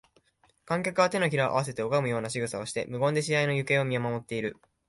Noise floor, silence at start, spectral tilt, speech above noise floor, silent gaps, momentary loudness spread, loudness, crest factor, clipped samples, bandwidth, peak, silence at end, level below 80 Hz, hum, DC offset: -67 dBFS; 0.65 s; -5 dB/octave; 39 dB; none; 8 LU; -28 LUFS; 18 dB; under 0.1%; 11.5 kHz; -10 dBFS; 0.35 s; -64 dBFS; none; under 0.1%